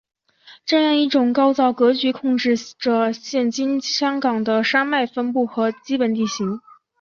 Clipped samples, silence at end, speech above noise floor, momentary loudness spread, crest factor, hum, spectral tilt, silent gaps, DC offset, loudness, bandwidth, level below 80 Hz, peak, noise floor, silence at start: under 0.1%; 0.4 s; 30 dB; 5 LU; 16 dB; none; -4 dB/octave; none; under 0.1%; -19 LUFS; 7.2 kHz; -68 dBFS; -4 dBFS; -49 dBFS; 0.45 s